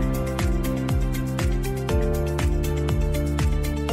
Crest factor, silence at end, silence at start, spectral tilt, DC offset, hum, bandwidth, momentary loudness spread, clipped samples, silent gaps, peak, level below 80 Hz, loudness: 10 dB; 0 s; 0 s; -6.5 dB/octave; under 0.1%; none; 16 kHz; 2 LU; under 0.1%; none; -12 dBFS; -26 dBFS; -25 LUFS